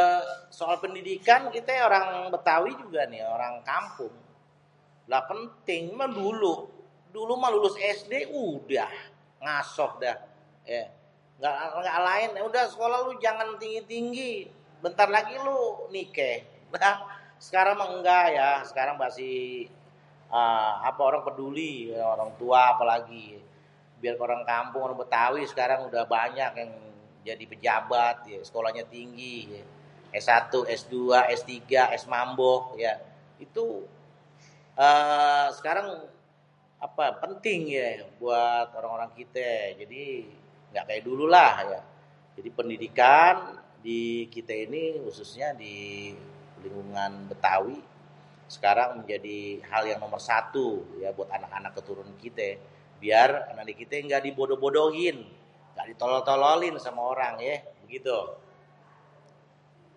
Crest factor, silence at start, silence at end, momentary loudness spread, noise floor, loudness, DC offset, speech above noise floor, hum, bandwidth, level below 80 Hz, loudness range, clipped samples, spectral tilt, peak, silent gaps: 24 dB; 0 s; 1.6 s; 18 LU; -62 dBFS; -27 LUFS; under 0.1%; 35 dB; none; 10.5 kHz; -76 dBFS; 7 LU; under 0.1%; -4 dB/octave; -4 dBFS; none